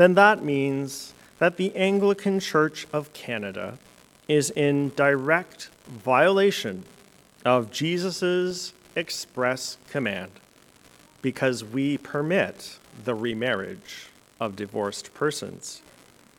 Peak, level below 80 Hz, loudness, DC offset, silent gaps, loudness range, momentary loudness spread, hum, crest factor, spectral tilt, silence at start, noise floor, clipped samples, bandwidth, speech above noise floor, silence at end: -2 dBFS; -68 dBFS; -25 LUFS; under 0.1%; none; 6 LU; 17 LU; none; 24 dB; -5 dB/octave; 0 s; -55 dBFS; under 0.1%; 17.5 kHz; 31 dB; 0.6 s